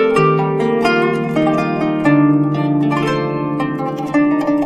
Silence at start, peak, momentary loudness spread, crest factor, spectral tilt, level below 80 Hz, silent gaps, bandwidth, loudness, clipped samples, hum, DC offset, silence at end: 0 s; 0 dBFS; 7 LU; 14 dB; -7.5 dB/octave; -48 dBFS; none; 10 kHz; -16 LUFS; under 0.1%; none; under 0.1%; 0 s